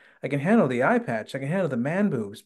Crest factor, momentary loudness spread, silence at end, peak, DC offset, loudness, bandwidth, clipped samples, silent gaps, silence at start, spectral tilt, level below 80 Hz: 16 dB; 9 LU; 0.05 s; -8 dBFS; under 0.1%; -24 LUFS; 12 kHz; under 0.1%; none; 0.25 s; -7.5 dB/octave; -72 dBFS